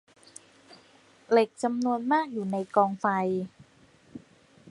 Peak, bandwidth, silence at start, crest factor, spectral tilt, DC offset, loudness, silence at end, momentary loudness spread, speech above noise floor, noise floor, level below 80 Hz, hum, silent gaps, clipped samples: -8 dBFS; 11.5 kHz; 0.7 s; 22 dB; -6 dB/octave; under 0.1%; -27 LUFS; 0 s; 24 LU; 33 dB; -59 dBFS; -74 dBFS; none; none; under 0.1%